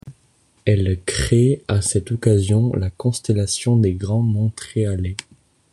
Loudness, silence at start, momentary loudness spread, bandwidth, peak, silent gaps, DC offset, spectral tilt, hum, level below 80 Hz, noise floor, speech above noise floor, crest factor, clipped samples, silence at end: -20 LUFS; 0.05 s; 6 LU; 12 kHz; -2 dBFS; none; under 0.1%; -6 dB/octave; none; -40 dBFS; -59 dBFS; 41 dB; 16 dB; under 0.1%; 0.5 s